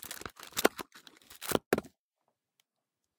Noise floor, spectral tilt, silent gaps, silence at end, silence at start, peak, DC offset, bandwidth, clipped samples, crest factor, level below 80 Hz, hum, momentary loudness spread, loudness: -87 dBFS; -3 dB/octave; 1.66-1.71 s; 1.3 s; 0 s; -6 dBFS; under 0.1%; 19 kHz; under 0.1%; 32 dB; -66 dBFS; none; 20 LU; -34 LUFS